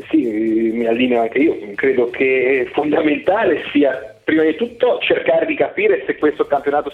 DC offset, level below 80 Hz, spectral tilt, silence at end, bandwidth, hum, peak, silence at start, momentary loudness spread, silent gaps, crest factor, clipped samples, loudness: under 0.1%; -54 dBFS; -7 dB/octave; 0 s; 4.6 kHz; none; -4 dBFS; 0 s; 3 LU; none; 14 dB; under 0.1%; -17 LUFS